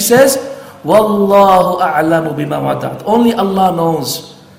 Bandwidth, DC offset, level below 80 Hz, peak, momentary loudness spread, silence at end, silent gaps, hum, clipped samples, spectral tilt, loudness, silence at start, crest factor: 17 kHz; under 0.1%; -48 dBFS; 0 dBFS; 10 LU; 0.25 s; none; none; 0.3%; -5 dB/octave; -12 LUFS; 0 s; 12 dB